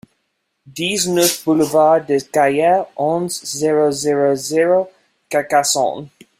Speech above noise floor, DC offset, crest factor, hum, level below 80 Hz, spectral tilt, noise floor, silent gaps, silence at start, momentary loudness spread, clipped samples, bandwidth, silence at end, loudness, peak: 54 dB; under 0.1%; 16 dB; none; -62 dBFS; -3.5 dB/octave; -70 dBFS; none; 0.65 s; 8 LU; under 0.1%; 16 kHz; 0.3 s; -16 LUFS; -2 dBFS